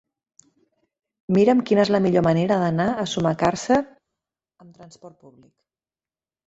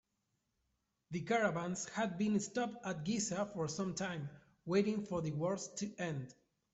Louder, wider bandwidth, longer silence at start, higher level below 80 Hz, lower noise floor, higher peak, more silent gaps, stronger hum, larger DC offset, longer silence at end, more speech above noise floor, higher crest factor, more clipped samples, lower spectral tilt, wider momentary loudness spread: first, -20 LUFS vs -38 LUFS; about the same, 8 kHz vs 8.2 kHz; first, 1.3 s vs 1.1 s; first, -56 dBFS vs -72 dBFS; first, under -90 dBFS vs -84 dBFS; first, -4 dBFS vs -20 dBFS; neither; neither; neither; first, 1.35 s vs 0.4 s; first, over 69 dB vs 47 dB; about the same, 18 dB vs 18 dB; neither; first, -6.5 dB/octave vs -5 dB/octave; second, 6 LU vs 11 LU